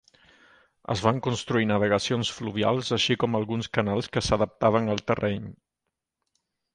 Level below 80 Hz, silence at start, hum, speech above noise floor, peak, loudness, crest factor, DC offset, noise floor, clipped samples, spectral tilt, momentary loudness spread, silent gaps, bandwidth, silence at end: -52 dBFS; 0.9 s; none; 59 dB; -6 dBFS; -26 LUFS; 22 dB; under 0.1%; -84 dBFS; under 0.1%; -5 dB/octave; 6 LU; none; 11 kHz; 1.2 s